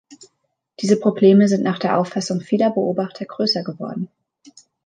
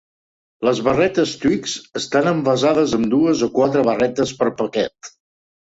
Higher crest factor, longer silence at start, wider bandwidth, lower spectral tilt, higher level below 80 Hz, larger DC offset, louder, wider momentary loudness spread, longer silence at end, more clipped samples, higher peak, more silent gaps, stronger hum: about the same, 18 dB vs 18 dB; second, 0.1 s vs 0.6 s; first, 9.4 kHz vs 8 kHz; about the same, -6 dB/octave vs -5 dB/octave; second, -70 dBFS vs -52 dBFS; neither; about the same, -19 LUFS vs -18 LUFS; first, 15 LU vs 6 LU; first, 0.8 s vs 0.55 s; neither; about the same, -2 dBFS vs 0 dBFS; neither; neither